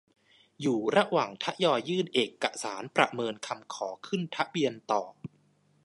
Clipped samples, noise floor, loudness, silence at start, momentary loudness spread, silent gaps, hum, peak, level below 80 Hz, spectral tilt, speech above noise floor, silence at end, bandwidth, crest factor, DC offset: under 0.1%; -67 dBFS; -30 LUFS; 0.6 s; 11 LU; none; none; -6 dBFS; -78 dBFS; -4.5 dB/octave; 37 dB; 0.55 s; 11.5 kHz; 24 dB; under 0.1%